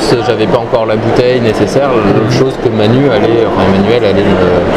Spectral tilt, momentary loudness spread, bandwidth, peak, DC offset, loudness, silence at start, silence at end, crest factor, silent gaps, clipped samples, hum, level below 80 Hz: -6.5 dB/octave; 2 LU; 13.5 kHz; 0 dBFS; under 0.1%; -9 LUFS; 0 s; 0 s; 8 dB; none; 0.4%; none; -30 dBFS